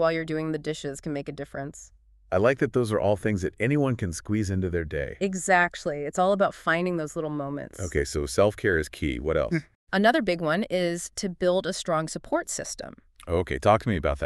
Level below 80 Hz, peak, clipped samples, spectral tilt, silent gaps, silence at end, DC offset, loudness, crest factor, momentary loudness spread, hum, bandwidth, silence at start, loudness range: -44 dBFS; -6 dBFS; under 0.1%; -5 dB/octave; 9.75-9.87 s; 0 s; under 0.1%; -26 LUFS; 20 dB; 11 LU; none; 13.5 kHz; 0 s; 2 LU